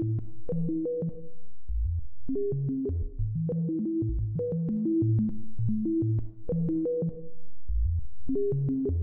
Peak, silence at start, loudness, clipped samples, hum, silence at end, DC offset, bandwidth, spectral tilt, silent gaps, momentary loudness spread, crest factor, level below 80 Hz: -18 dBFS; 0 s; -30 LUFS; under 0.1%; none; 0 s; under 0.1%; 1.4 kHz; -15.5 dB/octave; none; 8 LU; 8 dB; -38 dBFS